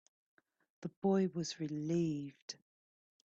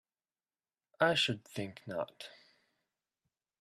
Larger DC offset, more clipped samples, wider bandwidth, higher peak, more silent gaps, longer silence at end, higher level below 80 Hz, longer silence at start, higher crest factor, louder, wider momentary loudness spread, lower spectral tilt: neither; neither; second, 7.8 kHz vs 14 kHz; second, -24 dBFS vs -14 dBFS; first, 0.97-1.02 s, 2.42-2.48 s vs none; second, 0.8 s vs 1.3 s; about the same, -78 dBFS vs -78 dBFS; second, 0.8 s vs 1 s; second, 16 dB vs 24 dB; second, -37 LUFS vs -34 LUFS; about the same, 16 LU vs 18 LU; first, -6.5 dB/octave vs -4 dB/octave